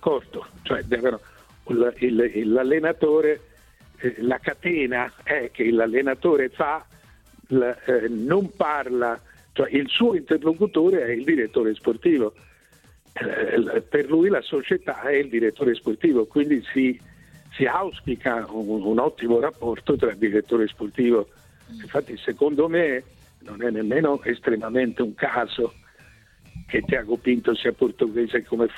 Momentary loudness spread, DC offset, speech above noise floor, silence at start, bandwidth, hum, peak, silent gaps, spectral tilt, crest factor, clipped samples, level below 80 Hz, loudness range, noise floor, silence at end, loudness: 8 LU; under 0.1%; 33 dB; 0 s; 11 kHz; none; -6 dBFS; none; -7 dB/octave; 16 dB; under 0.1%; -54 dBFS; 3 LU; -55 dBFS; 0 s; -23 LUFS